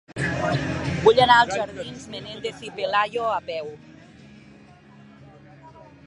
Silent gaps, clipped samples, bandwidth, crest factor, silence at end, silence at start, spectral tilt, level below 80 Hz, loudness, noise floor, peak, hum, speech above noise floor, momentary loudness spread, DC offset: none; under 0.1%; 11 kHz; 22 dB; 0.2 s; 0.1 s; -5 dB/octave; -50 dBFS; -22 LUFS; -49 dBFS; -2 dBFS; none; 27 dB; 19 LU; under 0.1%